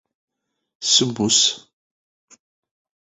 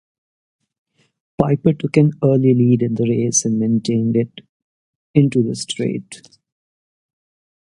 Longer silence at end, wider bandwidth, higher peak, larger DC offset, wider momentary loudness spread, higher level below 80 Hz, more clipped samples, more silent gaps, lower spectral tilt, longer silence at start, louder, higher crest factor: about the same, 1.5 s vs 1.6 s; second, 8.4 kHz vs 11.5 kHz; second, -4 dBFS vs 0 dBFS; neither; first, 11 LU vs 8 LU; second, -62 dBFS vs -54 dBFS; neither; second, none vs 4.49-5.14 s; second, -2 dB/octave vs -6 dB/octave; second, 0.8 s vs 1.4 s; about the same, -17 LUFS vs -17 LUFS; about the same, 20 dB vs 18 dB